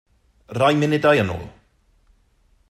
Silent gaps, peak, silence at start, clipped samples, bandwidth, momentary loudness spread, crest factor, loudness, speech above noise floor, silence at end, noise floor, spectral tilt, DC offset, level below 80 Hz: none; -4 dBFS; 0.5 s; under 0.1%; 14 kHz; 16 LU; 18 dB; -19 LUFS; 42 dB; 1.2 s; -60 dBFS; -6.5 dB/octave; under 0.1%; -54 dBFS